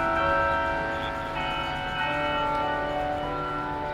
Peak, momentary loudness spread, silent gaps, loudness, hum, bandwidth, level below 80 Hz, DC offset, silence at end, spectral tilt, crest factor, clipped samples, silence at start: -12 dBFS; 6 LU; none; -27 LUFS; none; 15.5 kHz; -42 dBFS; under 0.1%; 0 s; -5.5 dB/octave; 16 dB; under 0.1%; 0 s